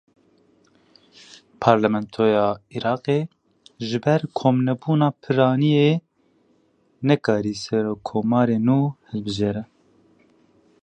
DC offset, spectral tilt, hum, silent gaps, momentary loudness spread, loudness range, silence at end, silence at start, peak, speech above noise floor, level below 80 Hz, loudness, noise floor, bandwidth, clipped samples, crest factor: under 0.1%; -7.5 dB/octave; none; none; 9 LU; 2 LU; 1.2 s; 1.6 s; -2 dBFS; 42 dB; -58 dBFS; -21 LUFS; -62 dBFS; 9.2 kHz; under 0.1%; 22 dB